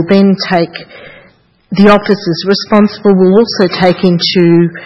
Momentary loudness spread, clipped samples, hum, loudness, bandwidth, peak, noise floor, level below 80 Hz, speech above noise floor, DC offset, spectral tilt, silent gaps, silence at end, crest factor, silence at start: 6 LU; 0.7%; none; -9 LUFS; 6.4 kHz; 0 dBFS; -46 dBFS; -44 dBFS; 37 dB; under 0.1%; -7 dB/octave; none; 0 s; 10 dB; 0 s